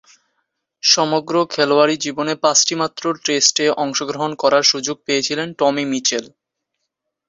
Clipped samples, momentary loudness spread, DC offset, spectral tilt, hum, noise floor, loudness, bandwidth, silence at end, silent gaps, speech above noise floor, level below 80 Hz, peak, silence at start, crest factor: under 0.1%; 8 LU; under 0.1%; -2 dB/octave; none; -77 dBFS; -17 LUFS; 7.8 kHz; 1 s; none; 59 dB; -66 dBFS; 0 dBFS; 0.85 s; 18 dB